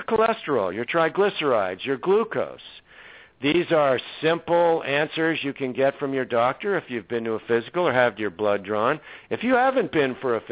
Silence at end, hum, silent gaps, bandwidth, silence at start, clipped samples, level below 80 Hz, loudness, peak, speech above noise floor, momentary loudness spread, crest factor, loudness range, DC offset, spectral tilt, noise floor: 0 s; none; none; 4 kHz; 0 s; under 0.1%; -62 dBFS; -23 LUFS; -6 dBFS; 25 dB; 7 LU; 18 dB; 2 LU; under 0.1%; -9.5 dB/octave; -48 dBFS